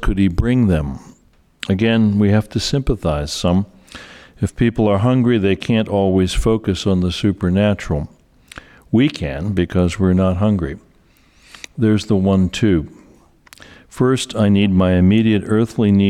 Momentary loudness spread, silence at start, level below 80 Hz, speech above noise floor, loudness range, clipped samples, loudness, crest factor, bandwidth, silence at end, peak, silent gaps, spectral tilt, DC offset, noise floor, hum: 10 LU; 0 s; -32 dBFS; 37 dB; 3 LU; under 0.1%; -17 LUFS; 12 dB; 12.5 kHz; 0 s; -6 dBFS; none; -7 dB/octave; under 0.1%; -53 dBFS; none